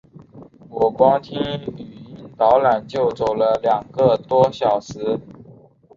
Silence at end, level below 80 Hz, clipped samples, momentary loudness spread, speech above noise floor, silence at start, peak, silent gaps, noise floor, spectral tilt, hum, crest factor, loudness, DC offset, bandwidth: 0.55 s; -54 dBFS; under 0.1%; 18 LU; 29 dB; 0.35 s; -2 dBFS; none; -47 dBFS; -6.5 dB/octave; none; 18 dB; -19 LUFS; under 0.1%; 7.4 kHz